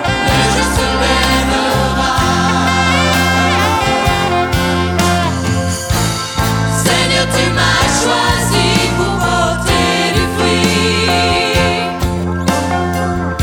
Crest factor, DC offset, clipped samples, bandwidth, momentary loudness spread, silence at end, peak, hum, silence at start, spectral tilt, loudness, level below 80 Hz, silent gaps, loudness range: 12 dB; under 0.1%; under 0.1%; over 20 kHz; 5 LU; 0 s; 0 dBFS; none; 0 s; -4 dB/octave; -13 LUFS; -26 dBFS; none; 2 LU